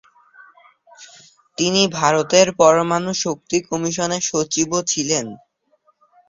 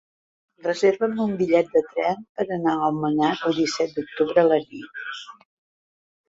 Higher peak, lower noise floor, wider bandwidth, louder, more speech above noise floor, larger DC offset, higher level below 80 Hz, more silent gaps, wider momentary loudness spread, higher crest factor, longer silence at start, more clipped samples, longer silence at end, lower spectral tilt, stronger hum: first, 0 dBFS vs -4 dBFS; second, -62 dBFS vs under -90 dBFS; about the same, 7.8 kHz vs 7.8 kHz; first, -18 LUFS vs -22 LUFS; second, 44 dB vs over 68 dB; neither; about the same, -60 dBFS vs -64 dBFS; second, none vs 2.29-2.35 s; second, 9 LU vs 14 LU; about the same, 20 dB vs 20 dB; first, 1 s vs 0.65 s; neither; about the same, 0.95 s vs 1 s; second, -3 dB/octave vs -5.5 dB/octave; neither